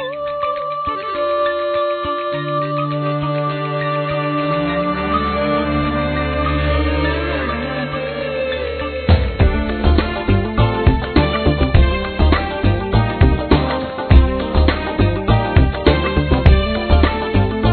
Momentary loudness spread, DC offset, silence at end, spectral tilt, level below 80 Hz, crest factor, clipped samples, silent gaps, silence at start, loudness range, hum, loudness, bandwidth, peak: 7 LU; under 0.1%; 0 s; -10 dB/octave; -20 dBFS; 16 dB; under 0.1%; none; 0 s; 4 LU; none; -17 LUFS; 4.6 kHz; 0 dBFS